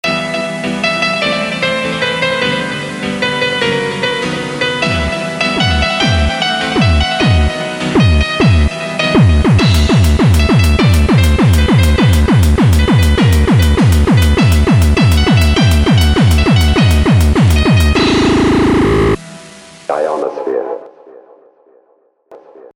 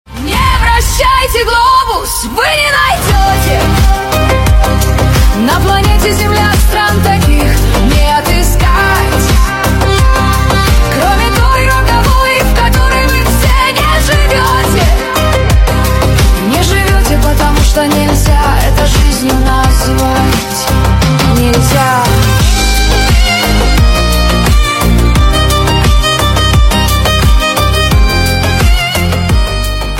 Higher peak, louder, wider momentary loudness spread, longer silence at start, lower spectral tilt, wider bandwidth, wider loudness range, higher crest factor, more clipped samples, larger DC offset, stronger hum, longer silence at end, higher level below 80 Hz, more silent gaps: about the same, 0 dBFS vs 0 dBFS; about the same, -11 LUFS vs -9 LUFS; first, 7 LU vs 2 LU; about the same, 0.05 s vs 0.1 s; first, -6 dB/octave vs -4.5 dB/octave; about the same, 17 kHz vs 17 kHz; first, 5 LU vs 1 LU; about the same, 10 dB vs 8 dB; second, under 0.1% vs 0.4%; neither; neither; first, 0.4 s vs 0 s; second, -18 dBFS vs -12 dBFS; neither